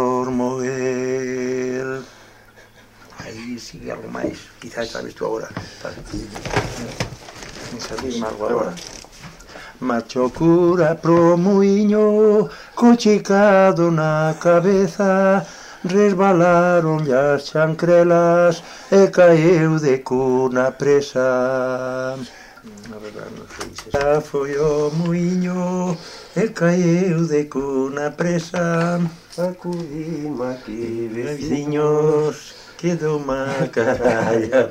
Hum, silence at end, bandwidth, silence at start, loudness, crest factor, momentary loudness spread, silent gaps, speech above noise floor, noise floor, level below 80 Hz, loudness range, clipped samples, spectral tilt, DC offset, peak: none; 0 s; 15 kHz; 0 s; -18 LUFS; 16 dB; 18 LU; none; 30 dB; -47 dBFS; -48 dBFS; 13 LU; under 0.1%; -6.5 dB/octave; under 0.1%; -2 dBFS